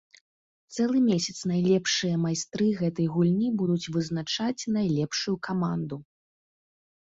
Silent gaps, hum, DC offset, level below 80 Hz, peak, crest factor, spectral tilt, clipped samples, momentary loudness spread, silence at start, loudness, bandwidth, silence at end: none; none; under 0.1%; -64 dBFS; -12 dBFS; 16 dB; -5.5 dB/octave; under 0.1%; 6 LU; 0.7 s; -27 LUFS; 8 kHz; 1 s